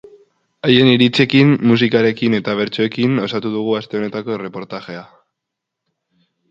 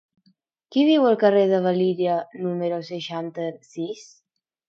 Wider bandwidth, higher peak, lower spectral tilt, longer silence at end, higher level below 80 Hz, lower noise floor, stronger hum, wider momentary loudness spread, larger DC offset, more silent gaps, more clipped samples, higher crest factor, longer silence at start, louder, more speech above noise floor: about the same, 7.6 kHz vs 7.6 kHz; first, 0 dBFS vs -4 dBFS; about the same, -7 dB/octave vs -7 dB/octave; first, 1.45 s vs 0.65 s; first, -58 dBFS vs -76 dBFS; first, -80 dBFS vs -65 dBFS; neither; about the same, 16 LU vs 15 LU; neither; neither; neither; about the same, 16 dB vs 18 dB; about the same, 0.65 s vs 0.7 s; first, -15 LUFS vs -22 LUFS; first, 65 dB vs 43 dB